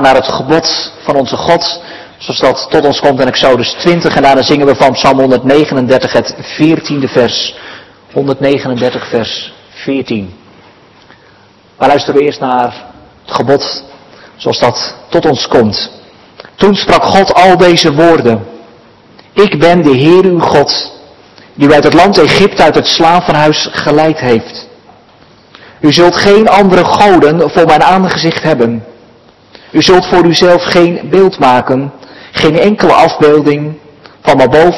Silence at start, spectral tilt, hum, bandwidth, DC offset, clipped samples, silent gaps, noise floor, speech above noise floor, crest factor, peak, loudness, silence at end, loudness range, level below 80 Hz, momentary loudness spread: 0 s; -5 dB/octave; none; 12 kHz; under 0.1%; 5%; none; -42 dBFS; 34 dB; 8 dB; 0 dBFS; -8 LUFS; 0 s; 7 LU; -40 dBFS; 12 LU